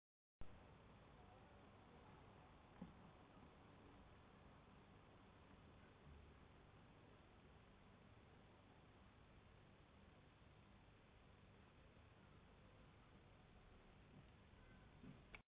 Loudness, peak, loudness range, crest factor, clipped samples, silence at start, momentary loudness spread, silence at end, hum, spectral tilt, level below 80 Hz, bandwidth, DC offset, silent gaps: -68 LUFS; -44 dBFS; 3 LU; 22 dB; under 0.1%; 0.4 s; 4 LU; 0 s; none; -5 dB/octave; -74 dBFS; 4 kHz; under 0.1%; none